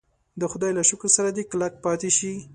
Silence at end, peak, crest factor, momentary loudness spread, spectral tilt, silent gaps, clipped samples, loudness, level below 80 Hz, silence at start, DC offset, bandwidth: 0 s; -4 dBFS; 20 dB; 8 LU; -3 dB/octave; none; under 0.1%; -22 LUFS; -62 dBFS; 0.35 s; under 0.1%; 11 kHz